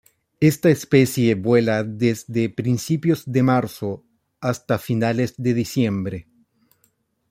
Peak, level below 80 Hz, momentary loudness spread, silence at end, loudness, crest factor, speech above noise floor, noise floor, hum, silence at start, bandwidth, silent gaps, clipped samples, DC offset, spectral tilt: -2 dBFS; -58 dBFS; 11 LU; 1.1 s; -21 LUFS; 18 dB; 46 dB; -66 dBFS; none; 0.4 s; 16.5 kHz; none; under 0.1%; under 0.1%; -6.5 dB/octave